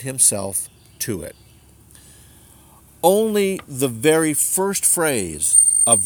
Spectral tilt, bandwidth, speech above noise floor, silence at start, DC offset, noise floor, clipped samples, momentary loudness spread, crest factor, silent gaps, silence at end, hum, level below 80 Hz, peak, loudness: -2.5 dB/octave; over 20 kHz; 30 dB; 0 s; under 0.1%; -49 dBFS; under 0.1%; 15 LU; 18 dB; none; 0 s; none; -52 dBFS; -2 dBFS; -17 LUFS